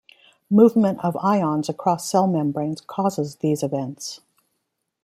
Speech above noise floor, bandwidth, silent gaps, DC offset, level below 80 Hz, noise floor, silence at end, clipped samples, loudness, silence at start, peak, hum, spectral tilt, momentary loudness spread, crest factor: 56 dB; 15.5 kHz; none; under 0.1%; -66 dBFS; -77 dBFS; 0.85 s; under 0.1%; -21 LUFS; 0.5 s; -2 dBFS; none; -6.5 dB/octave; 12 LU; 20 dB